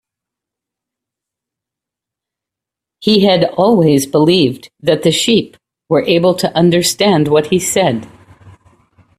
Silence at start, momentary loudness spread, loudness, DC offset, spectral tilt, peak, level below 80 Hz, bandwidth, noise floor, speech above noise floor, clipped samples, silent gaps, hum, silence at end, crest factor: 3 s; 6 LU; -12 LUFS; under 0.1%; -5 dB/octave; 0 dBFS; -52 dBFS; 15 kHz; -84 dBFS; 72 dB; under 0.1%; none; none; 0.7 s; 14 dB